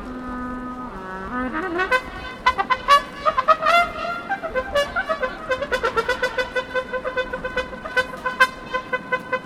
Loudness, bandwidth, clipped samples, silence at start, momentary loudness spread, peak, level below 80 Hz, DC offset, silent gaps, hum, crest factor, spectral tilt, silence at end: -22 LUFS; 16.5 kHz; under 0.1%; 0 s; 13 LU; 0 dBFS; -44 dBFS; under 0.1%; none; none; 22 dB; -3.5 dB/octave; 0 s